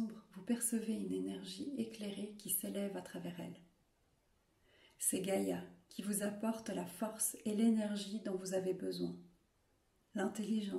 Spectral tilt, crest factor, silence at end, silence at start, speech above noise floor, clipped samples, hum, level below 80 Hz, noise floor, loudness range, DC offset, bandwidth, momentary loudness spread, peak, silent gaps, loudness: -4.5 dB/octave; 20 dB; 0 s; 0 s; 37 dB; under 0.1%; none; -80 dBFS; -76 dBFS; 5 LU; under 0.1%; 16 kHz; 11 LU; -20 dBFS; none; -40 LUFS